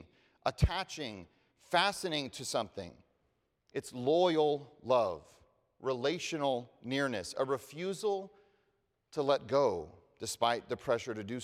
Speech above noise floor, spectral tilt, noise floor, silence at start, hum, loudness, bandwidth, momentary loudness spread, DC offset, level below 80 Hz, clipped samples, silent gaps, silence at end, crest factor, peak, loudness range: 45 dB; -4.5 dB/octave; -78 dBFS; 0 s; none; -34 LUFS; 16 kHz; 13 LU; under 0.1%; -52 dBFS; under 0.1%; none; 0 s; 22 dB; -14 dBFS; 3 LU